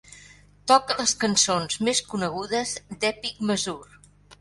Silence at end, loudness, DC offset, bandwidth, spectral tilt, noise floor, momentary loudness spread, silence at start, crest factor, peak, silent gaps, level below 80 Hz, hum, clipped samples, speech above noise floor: 0.05 s; -24 LUFS; under 0.1%; 11.5 kHz; -2.5 dB/octave; -51 dBFS; 10 LU; 0.1 s; 22 dB; -4 dBFS; none; -58 dBFS; 50 Hz at -45 dBFS; under 0.1%; 27 dB